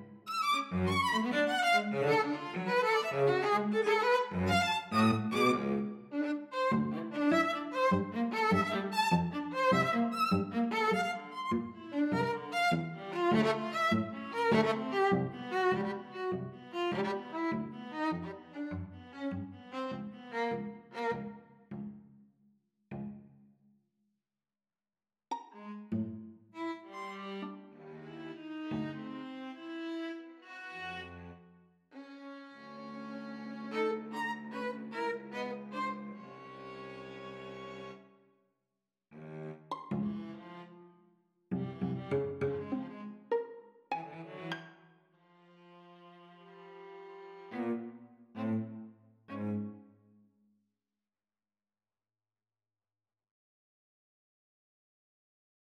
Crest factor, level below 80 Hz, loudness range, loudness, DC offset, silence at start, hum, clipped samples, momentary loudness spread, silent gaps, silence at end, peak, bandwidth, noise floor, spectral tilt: 20 dB; -72 dBFS; 16 LU; -34 LUFS; under 0.1%; 0 s; none; under 0.1%; 19 LU; none; 5.85 s; -16 dBFS; 15.5 kHz; under -90 dBFS; -6 dB/octave